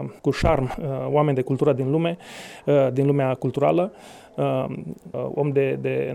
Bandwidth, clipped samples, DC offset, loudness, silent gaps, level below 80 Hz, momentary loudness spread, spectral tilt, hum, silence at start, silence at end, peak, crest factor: 12 kHz; under 0.1%; under 0.1%; -23 LUFS; none; -42 dBFS; 11 LU; -8 dB/octave; none; 0 s; 0 s; -6 dBFS; 16 dB